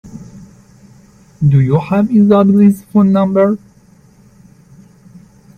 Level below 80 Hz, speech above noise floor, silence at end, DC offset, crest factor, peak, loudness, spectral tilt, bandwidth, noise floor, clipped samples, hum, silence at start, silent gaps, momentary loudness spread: -48 dBFS; 36 dB; 2 s; under 0.1%; 14 dB; 0 dBFS; -11 LUFS; -10 dB/octave; 9.8 kHz; -46 dBFS; under 0.1%; none; 0.05 s; none; 10 LU